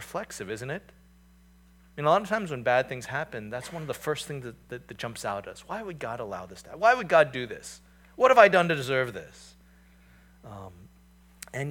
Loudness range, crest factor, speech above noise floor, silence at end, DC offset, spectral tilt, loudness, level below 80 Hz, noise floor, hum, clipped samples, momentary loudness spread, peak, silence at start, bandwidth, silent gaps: 11 LU; 26 dB; 30 dB; 0 s; under 0.1%; -4.5 dB/octave; -26 LUFS; -60 dBFS; -57 dBFS; none; under 0.1%; 23 LU; -2 dBFS; 0 s; 18 kHz; none